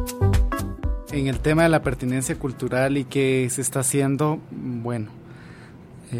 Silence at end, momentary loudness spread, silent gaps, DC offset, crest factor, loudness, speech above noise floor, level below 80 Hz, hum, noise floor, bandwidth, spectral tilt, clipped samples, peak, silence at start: 0 s; 15 LU; none; under 0.1%; 18 dB; -23 LUFS; 21 dB; -32 dBFS; none; -43 dBFS; 16 kHz; -5.5 dB/octave; under 0.1%; -4 dBFS; 0 s